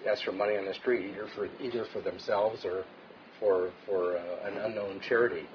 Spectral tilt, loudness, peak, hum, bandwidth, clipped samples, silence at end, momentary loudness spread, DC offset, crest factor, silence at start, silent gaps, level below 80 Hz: -3 dB/octave; -32 LUFS; -14 dBFS; none; 5.4 kHz; under 0.1%; 0 s; 9 LU; under 0.1%; 18 dB; 0 s; none; -72 dBFS